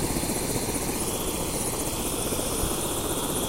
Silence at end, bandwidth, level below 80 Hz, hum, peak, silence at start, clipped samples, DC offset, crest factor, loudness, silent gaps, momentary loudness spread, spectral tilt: 0 s; 16 kHz; -38 dBFS; none; -12 dBFS; 0 s; under 0.1%; under 0.1%; 16 dB; -27 LUFS; none; 1 LU; -3.5 dB/octave